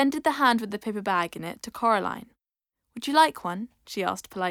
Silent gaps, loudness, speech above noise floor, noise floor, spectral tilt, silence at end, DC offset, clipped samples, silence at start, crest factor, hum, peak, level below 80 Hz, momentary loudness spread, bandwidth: none; -26 LUFS; 61 dB; -87 dBFS; -4 dB/octave; 0 s; under 0.1%; under 0.1%; 0 s; 20 dB; none; -6 dBFS; -66 dBFS; 15 LU; 18 kHz